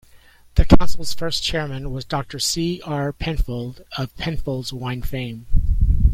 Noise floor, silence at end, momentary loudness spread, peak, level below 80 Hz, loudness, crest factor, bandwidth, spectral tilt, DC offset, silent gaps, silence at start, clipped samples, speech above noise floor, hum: -49 dBFS; 0 s; 11 LU; 0 dBFS; -24 dBFS; -23 LUFS; 18 dB; 15.5 kHz; -5 dB/octave; under 0.1%; none; 0.55 s; under 0.1%; 31 dB; none